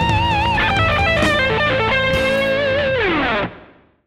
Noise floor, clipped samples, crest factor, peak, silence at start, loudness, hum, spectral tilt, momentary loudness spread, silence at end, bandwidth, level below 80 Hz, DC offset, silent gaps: -45 dBFS; under 0.1%; 14 dB; -4 dBFS; 0 s; -16 LUFS; none; -5.5 dB/octave; 3 LU; 0.4 s; 15.5 kHz; -32 dBFS; under 0.1%; none